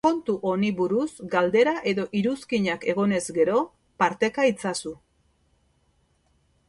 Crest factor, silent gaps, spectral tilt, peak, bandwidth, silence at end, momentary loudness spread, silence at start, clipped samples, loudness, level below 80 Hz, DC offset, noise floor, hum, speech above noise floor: 18 dB; none; -5.5 dB/octave; -6 dBFS; 11.5 kHz; 1.75 s; 6 LU; 0.05 s; under 0.1%; -24 LUFS; -64 dBFS; under 0.1%; -66 dBFS; none; 43 dB